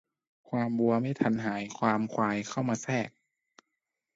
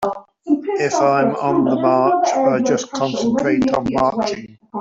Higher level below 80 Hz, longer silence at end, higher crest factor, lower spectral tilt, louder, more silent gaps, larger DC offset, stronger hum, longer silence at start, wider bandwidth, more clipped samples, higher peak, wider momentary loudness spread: second, -70 dBFS vs -52 dBFS; first, 1.05 s vs 0 s; first, 22 dB vs 14 dB; about the same, -6 dB/octave vs -5.5 dB/octave; second, -30 LUFS vs -17 LUFS; neither; neither; neither; first, 0.5 s vs 0 s; about the same, 7.8 kHz vs 7.8 kHz; neither; second, -10 dBFS vs -2 dBFS; about the same, 6 LU vs 8 LU